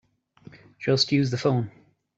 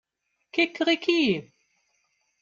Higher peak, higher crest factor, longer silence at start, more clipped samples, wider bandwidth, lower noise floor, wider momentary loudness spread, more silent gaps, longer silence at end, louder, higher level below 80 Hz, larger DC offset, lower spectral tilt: first, -6 dBFS vs -10 dBFS; about the same, 20 dB vs 18 dB; about the same, 0.55 s vs 0.55 s; neither; about the same, 8 kHz vs 7.4 kHz; second, -52 dBFS vs -78 dBFS; first, 11 LU vs 8 LU; neither; second, 0.5 s vs 1 s; about the same, -24 LUFS vs -24 LUFS; first, -66 dBFS vs -72 dBFS; neither; about the same, -5.5 dB/octave vs -4.5 dB/octave